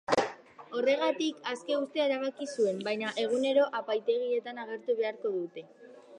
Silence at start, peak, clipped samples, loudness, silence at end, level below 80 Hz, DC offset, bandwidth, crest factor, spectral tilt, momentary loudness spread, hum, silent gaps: 0.1 s; -10 dBFS; under 0.1%; -31 LUFS; 0 s; -78 dBFS; under 0.1%; 10.5 kHz; 22 dB; -4 dB/octave; 10 LU; none; none